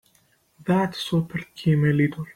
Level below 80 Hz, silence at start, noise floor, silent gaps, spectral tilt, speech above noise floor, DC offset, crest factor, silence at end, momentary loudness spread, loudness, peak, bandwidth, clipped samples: -56 dBFS; 0.6 s; -63 dBFS; none; -7.5 dB/octave; 41 dB; under 0.1%; 14 dB; 0.05 s; 9 LU; -23 LUFS; -10 dBFS; 15 kHz; under 0.1%